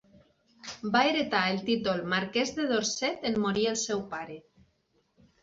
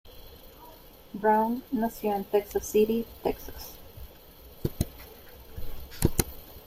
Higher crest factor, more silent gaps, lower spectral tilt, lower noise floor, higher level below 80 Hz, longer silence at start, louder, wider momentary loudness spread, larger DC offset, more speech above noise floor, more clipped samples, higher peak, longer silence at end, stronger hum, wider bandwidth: about the same, 22 dB vs 26 dB; neither; second, -3.5 dB/octave vs -5.5 dB/octave; first, -72 dBFS vs -50 dBFS; second, -64 dBFS vs -44 dBFS; first, 0.65 s vs 0.05 s; about the same, -28 LUFS vs -29 LUFS; second, 13 LU vs 24 LU; neither; first, 43 dB vs 23 dB; neither; second, -10 dBFS vs -4 dBFS; first, 1 s vs 0.05 s; neither; second, 8 kHz vs 16.5 kHz